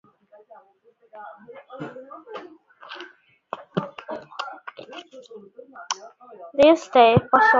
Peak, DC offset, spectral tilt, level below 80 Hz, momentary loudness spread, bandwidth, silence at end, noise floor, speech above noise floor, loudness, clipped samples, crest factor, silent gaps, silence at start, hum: -2 dBFS; under 0.1%; -5 dB/octave; -56 dBFS; 28 LU; 7.8 kHz; 0 s; -60 dBFS; 40 dB; -20 LUFS; under 0.1%; 22 dB; none; 1.2 s; none